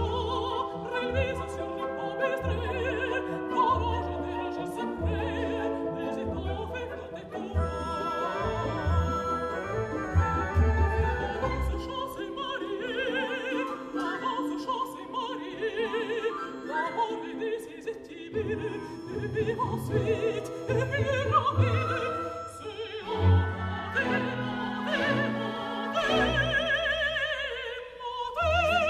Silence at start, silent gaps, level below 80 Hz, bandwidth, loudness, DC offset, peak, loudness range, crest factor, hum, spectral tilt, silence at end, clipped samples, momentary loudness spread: 0 s; none; -40 dBFS; 12.5 kHz; -30 LUFS; under 0.1%; -12 dBFS; 5 LU; 16 dB; none; -6 dB/octave; 0 s; under 0.1%; 10 LU